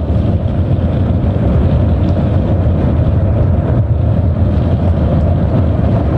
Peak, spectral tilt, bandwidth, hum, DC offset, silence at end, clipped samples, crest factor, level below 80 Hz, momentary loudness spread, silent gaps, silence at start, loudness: -4 dBFS; -11 dB/octave; 4.6 kHz; none; under 0.1%; 0 s; under 0.1%; 8 dB; -20 dBFS; 1 LU; none; 0 s; -13 LUFS